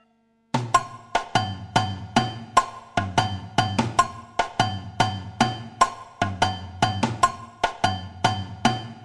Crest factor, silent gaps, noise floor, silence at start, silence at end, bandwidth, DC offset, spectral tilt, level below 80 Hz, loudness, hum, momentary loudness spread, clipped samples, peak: 22 dB; none; -64 dBFS; 0.55 s; 0 s; 13.5 kHz; under 0.1%; -4.5 dB/octave; -48 dBFS; -25 LUFS; none; 6 LU; under 0.1%; -4 dBFS